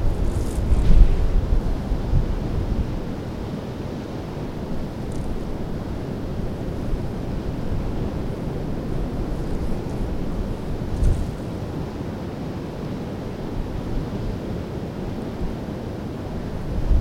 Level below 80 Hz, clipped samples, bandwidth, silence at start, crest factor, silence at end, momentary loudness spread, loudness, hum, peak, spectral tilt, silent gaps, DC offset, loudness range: -26 dBFS; under 0.1%; 11.5 kHz; 0 s; 22 dB; 0 s; 7 LU; -27 LUFS; none; 0 dBFS; -8 dB/octave; none; under 0.1%; 6 LU